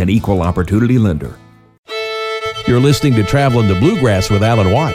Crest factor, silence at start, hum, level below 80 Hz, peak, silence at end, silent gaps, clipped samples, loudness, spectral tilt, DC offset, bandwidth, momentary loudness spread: 12 dB; 0 s; none; -34 dBFS; -2 dBFS; 0 s; 1.78-1.83 s; under 0.1%; -14 LUFS; -6.5 dB/octave; under 0.1%; 15.5 kHz; 9 LU